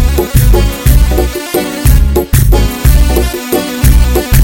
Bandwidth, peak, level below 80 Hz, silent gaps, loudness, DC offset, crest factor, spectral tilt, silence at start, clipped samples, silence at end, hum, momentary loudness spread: 17.5 kHz; 0 dBFS; -10 dBFS; none; -10 LUFS; under 0.1%; 8 dB; -5.5 dB/octave; 0 s; 0.6%; 0 s; none; 5 LU